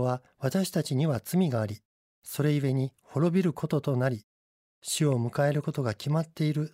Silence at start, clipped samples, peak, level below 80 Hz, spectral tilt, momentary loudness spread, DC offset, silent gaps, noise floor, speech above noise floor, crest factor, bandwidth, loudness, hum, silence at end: 0 s; under 0.1%; -14 dBFS; -68 dBFS; -6.5 dB/octave; 7 LU; under 0.1%; 1.85-2.22 s, 4.24-4.82 s; under -90 dBFS; over 62 dB; 16 dB; 16 kHz; -29 LUFS; none; 0.05 s